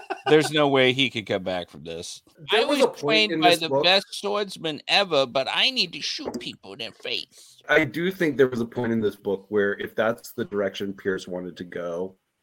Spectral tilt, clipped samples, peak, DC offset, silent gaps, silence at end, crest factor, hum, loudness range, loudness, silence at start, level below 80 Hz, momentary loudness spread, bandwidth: -4 dB/octave; under 0.1%; -4 dBFS; under 0.1%; none; 0.3 s; 20 dB; none; 6 LU; -23 LUFS; 0 s; -64 dBFS; 16 LU; 17 kHz